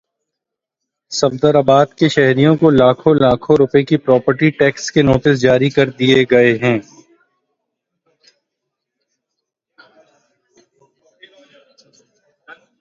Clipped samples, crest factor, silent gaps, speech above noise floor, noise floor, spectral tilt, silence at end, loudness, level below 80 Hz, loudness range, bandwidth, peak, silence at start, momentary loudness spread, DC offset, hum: under 0.1%; 16 dB; none; 69 dB; -82 dBFS; -6 dB/octave; 0.3 s; -13 LUFS; -48 dBFS; 6 LU; 7.8 kHz; 0 dBFS; 1.1 s; 5 LU; under 0.1%; none